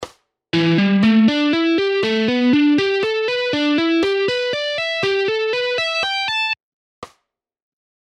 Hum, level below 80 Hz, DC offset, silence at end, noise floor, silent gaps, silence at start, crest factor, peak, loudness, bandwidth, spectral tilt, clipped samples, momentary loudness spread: none; -60 dBFS; under 0.1%; 0.95 s; -70 dBFS; 6.63-7.02 s; 0 s; 14 dB; -4 dBFS; -17 LUFS; 10.5 kHz; -5.5 dB/octave; under 0.1%; 6 LU